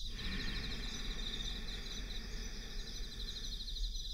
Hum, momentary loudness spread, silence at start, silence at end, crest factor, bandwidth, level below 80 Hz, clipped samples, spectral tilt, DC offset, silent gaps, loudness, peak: none; 5 LU; 0 s; 0 s; 14 dB; 16 kHz; -44 dBFS; under 0.1%; -3 dB/octave; under 0.1%; none; -43 LUFS; -28 dBFS